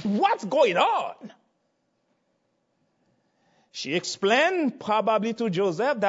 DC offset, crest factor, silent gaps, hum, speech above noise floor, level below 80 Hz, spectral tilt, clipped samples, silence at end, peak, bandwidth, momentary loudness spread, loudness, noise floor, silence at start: under 0.1%; 18 dB; none; none; 49 dB; -76 dBFS; -4.5 dB/octave; under 0.1%; 0 s; -8 dBFS; 8 kHz; 8 LU; -24 LUFS; -73 dBFS; 0 s